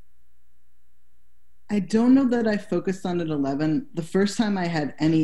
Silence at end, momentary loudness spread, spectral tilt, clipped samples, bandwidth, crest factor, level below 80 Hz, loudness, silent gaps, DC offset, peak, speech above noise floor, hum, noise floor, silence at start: 0 s; 9 LU; -6.5 dB/octave; under 0.1%; 12 kHz; 14 dB; -58 dBFS; -24 LUFS; none; 1%; -10 dBFS; 45 dB; none; -67 dBFS; 1.7 s